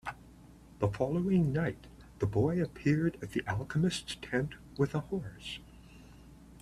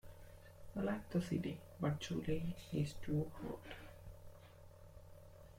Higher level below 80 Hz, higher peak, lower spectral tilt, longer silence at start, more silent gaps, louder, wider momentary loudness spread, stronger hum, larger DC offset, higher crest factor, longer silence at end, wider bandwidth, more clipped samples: about the same, -56 dBFS vs -60 dBFS; first, -14 dBFS vs -26 dBFS; about the same, -6.5 dB/octave vs -7 dB/octave; about the same, 0.05 s vs 0.05 s; neither; first, -33 LUFS vs -43 LUFS; second, 14 LU vs 21 LU; neither; neither; about the same, 20 dB vs 18 dB; about the same, 0 s vs 0 s; second, 13 kHz vs 16.5 kHz; neither